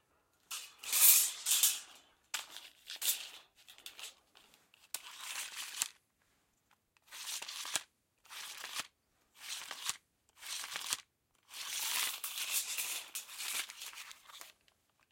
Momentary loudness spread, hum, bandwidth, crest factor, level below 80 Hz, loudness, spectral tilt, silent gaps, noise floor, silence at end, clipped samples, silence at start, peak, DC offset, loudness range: 22 LU; none; 16.5 kHz; 32 dB; -88 dBFS; -34 LUFS; 4 dB/octave; none; -76 dBFS; 0.6 s; under 0.1%; 0.5 s; -8 dBFS; under 0.1%; 14 LU